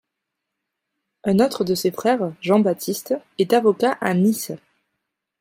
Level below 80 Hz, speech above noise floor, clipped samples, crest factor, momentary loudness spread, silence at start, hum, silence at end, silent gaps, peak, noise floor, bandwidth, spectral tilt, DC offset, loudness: -64 dBFS; 62 dB; under 0.1%; 18 dB; 10 LU; 1.25 s; none; 0.85 s; none; -4 dBFS; -81 dBFS; 16.5 kHz; -5.5 dB/octave; under 0.1%; -20 LUFS